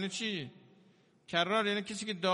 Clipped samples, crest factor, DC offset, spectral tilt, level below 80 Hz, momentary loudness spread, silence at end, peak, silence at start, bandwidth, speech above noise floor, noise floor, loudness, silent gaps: under 0.1%; 20 dB; under 0.1%; -3.5 dB/octave; -78 dBFS; 10 LU; 0 s; -14 dBFS; 0 s; 10.5 kHz; 32 dB; -65 dBFS; -33 LUFS; none